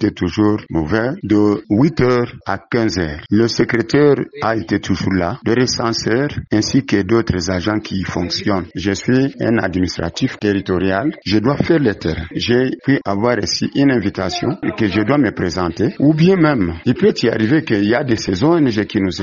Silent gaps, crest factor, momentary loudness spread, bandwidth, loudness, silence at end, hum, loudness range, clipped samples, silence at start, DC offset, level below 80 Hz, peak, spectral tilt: none; 16 dB; 6 LU; 7.4 kHz; -16 LUFS; 0 s; none; 3 LU; under 0.1%; 0 s; under 0.1%; -42 dBFS; 0 dBFS; -5.5 dB/octave